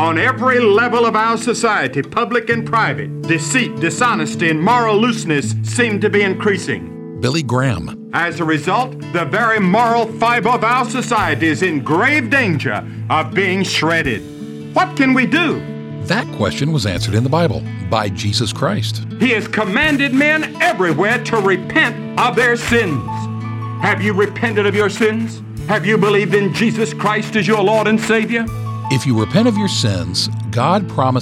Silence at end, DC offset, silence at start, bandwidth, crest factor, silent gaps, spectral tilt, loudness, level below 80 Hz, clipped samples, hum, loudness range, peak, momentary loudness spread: 0 s; under 0.1%; 0 s; 15.5 kHz; 16 dB; none; -5 dB/octave; -16 LUFS; -46 dBFS; under 0.1%; none; 3 LU; 0 dBFS; 7 LU